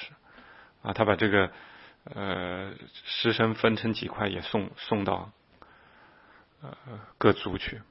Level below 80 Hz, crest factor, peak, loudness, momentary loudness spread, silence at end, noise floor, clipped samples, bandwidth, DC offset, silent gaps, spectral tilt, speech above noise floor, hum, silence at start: -58 dBFS; 24 dB; -6 dBFS; -28 LUFS; 21 LU; 0.1 s; -58 dBFS; under 0.1%; 5.8 kHz; under 0.1%; none; -9.5 dB/octave; 29 dB; none; 0 s